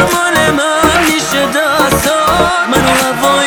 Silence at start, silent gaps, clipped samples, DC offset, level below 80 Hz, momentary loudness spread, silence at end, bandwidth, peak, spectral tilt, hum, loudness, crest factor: 0 s; none; under 0.1%; 0.3%; -32 dBFS; 2 LU; 0 s; over 20 kHz; 0 dBFS; -3 dB/octave; none; -10 LUFS; 10 dB